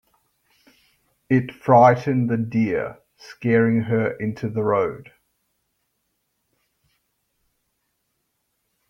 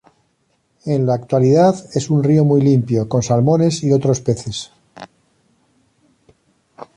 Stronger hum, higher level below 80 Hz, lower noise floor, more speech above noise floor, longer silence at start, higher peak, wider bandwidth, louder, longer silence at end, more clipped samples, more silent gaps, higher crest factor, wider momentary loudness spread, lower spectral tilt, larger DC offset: neither; second, -62 dBFS vs -52 dBFS; first, -74 dBFS vs -64 dBFS; first, 54 dB vs 49 dB; first, 1.3 s vs 0.85 s; about the same, -2 dBFS vs -2 dBFS; second, 6.6 kHz vs 10.5 kHz; second, -20 LUFS vs -16 LUFS; first, 3.85 s vs 0.15 s; neither; neither; first, 22 dB vs 14 dB; first, 13 LU vs 10 LU; first, -9 dB/octave vs -7 dB/octave; neither